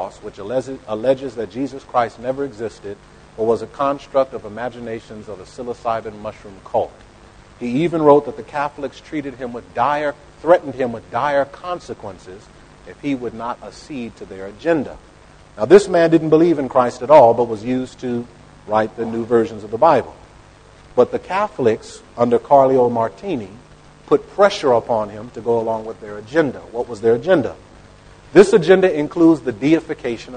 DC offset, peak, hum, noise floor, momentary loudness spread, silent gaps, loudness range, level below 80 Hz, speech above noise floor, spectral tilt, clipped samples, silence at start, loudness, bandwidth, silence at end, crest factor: under 0.1%; 0 dBFS; none; -45 dBFS; 18 LU; none; 10 LU; -50 dBFS; 27 dB; -6.5 dB/octave; under 0.1%; 0 s; -18 LUFS; 9.6 kHz; 0 s; 18 dB